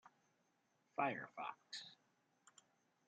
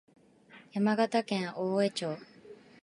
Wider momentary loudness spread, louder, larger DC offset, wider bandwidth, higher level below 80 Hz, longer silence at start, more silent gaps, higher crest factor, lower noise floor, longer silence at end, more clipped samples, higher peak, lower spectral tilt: second, 10 LU vs 13 LU; second, -46 LUFS vs -31 LUFS; neither; second, 8.8 kHz vs 11.5 kHz; second, under -90 dBFS vs -82 dBFS; second, 0.05 s vs 0.55 s; neither; first, 24 dB vs 18 dB; first, -82 dBFS vs -57 dBFS; first, 1.15 s vs 0.3 s; neither; second, -26 dBFS vs -14 dBFS; second, -4 dB/octave vs -5.5 dB/octave